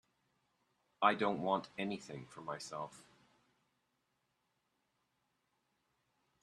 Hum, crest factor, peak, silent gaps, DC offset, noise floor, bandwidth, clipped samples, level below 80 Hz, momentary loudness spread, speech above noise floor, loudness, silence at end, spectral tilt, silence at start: none; 30 dB; -14 dBFS; none; under 0.1%; -83 dBFS; 12.5 kHz; under 0.1%; -82 dBFS; 15 LU; 45 dB; -38 LUFS; 3.4 s; -5 dB/octave; 1 s